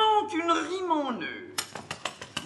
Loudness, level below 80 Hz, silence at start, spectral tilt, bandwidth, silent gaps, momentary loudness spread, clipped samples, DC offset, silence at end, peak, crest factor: -29 LUFS; -72 dBFS; 0 s; -2.5 dB/octave; 13 kHz; none; 10 LU; under 0.1%; under 0.1%; 0 s; -12 dBFS; 16 dB